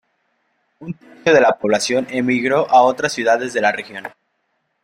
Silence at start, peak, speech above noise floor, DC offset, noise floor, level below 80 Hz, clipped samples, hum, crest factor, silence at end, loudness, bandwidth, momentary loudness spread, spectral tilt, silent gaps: 0.8 s; -2 dBFS; 53 dB; under 0.1%; -69 dBFS; -62 dBFS; under 0.1%; none; 16 dB; 0.75 s; -16 LUFS; 15.5 kHz; 20 LU; -4 dB/octave; none